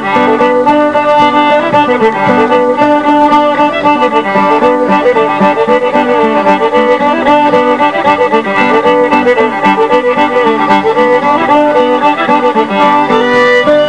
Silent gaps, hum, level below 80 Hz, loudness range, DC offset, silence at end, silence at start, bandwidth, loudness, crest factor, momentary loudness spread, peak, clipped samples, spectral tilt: none; none; -48 dBFS; 1 LU; 0.7%; 0 s; 0 s; 10.5 kHz; -8 LUFS; 8 dB; 2 LU; 0 dBFS; 0.7%; -6 dB/octave